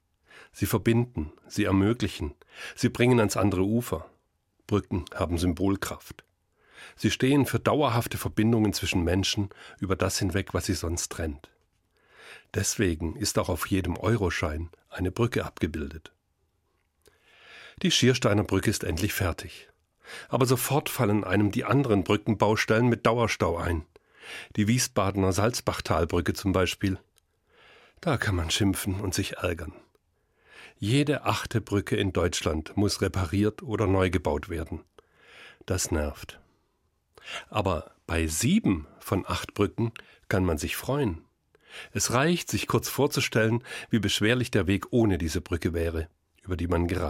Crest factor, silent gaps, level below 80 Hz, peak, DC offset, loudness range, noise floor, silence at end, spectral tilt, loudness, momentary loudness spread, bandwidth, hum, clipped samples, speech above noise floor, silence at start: 22 dB; none; -48 dBFS; -6 dBFS; under 0.1%; 5 LU; -73 dBFS; 0 s; -5 dB/octave; -27 LUFS; 13 LU; 16.5 kHz; none; under 0.1%; 46 dB; 0.35 s